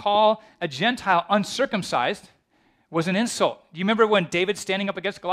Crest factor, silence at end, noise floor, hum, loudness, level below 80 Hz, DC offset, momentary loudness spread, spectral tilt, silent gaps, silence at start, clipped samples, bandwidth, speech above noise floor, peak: 20 dB; 0 s; -64 dBFS; none; -23 LUFS; -64 dBFS; under 0.1%; 9 LU; -4.5 dB/octave; none; 0 s; under 0.1%; 15 kHz; 41 dB; -4 dBFS